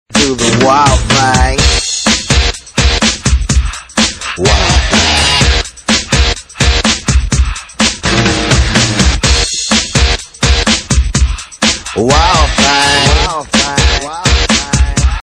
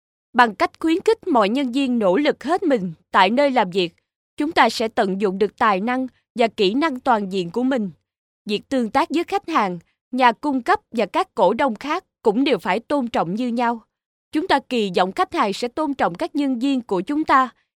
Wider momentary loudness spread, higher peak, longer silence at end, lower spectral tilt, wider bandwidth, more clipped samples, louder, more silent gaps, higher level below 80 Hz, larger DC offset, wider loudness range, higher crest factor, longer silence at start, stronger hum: about the same, 6 LU vs 7 LU; about the same, 0 dBFS vs 0 dBFS; second, 0 s vs 0.3 s; second, -3 dB/octave vs -5.5 dB/octave; second, 11 kHz vs 14.5 kHz; neither; first, -10 LUFS vs -20 LUFS; second, none vs 4.16-4.37 s, 6.30-6.35 s, 8.18-8.45 s, 10.01-10.11 s, 14.06-14.32 s; first, -16 dBFS vs -60 dBFS; neither; about the same, 1 LU vs 3 LU; second, 10 dB vs 20 dB; second, 0.1 s vs 0.35 s; neither